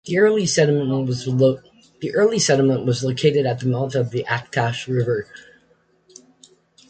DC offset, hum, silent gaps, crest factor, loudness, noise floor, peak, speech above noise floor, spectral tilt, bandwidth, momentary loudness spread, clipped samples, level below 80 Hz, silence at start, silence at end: under 0.1%; none; none; 18 dB; -20 LUFS; -60 dBFS; -4 dBFS; 41 dB; -5 dB/octave; 9.2 kHz; 7 LU; under 0.1%; -58 dBFS; 0.05 s; 1.5 s